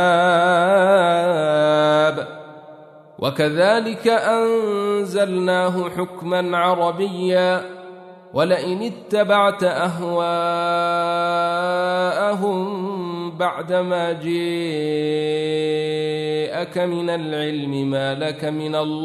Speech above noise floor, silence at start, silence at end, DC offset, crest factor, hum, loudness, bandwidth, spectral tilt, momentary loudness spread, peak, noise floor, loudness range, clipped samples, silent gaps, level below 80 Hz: 23 dB; 0 s; 0 s; under 0.1%; 16 dB; none; -20 LUFS; 13.5 kHz; -5.5 dB/octave; 9 LU; -4 dBFS; -43 dBFS; 4 LU; under 0.1%; none; -68 dBFS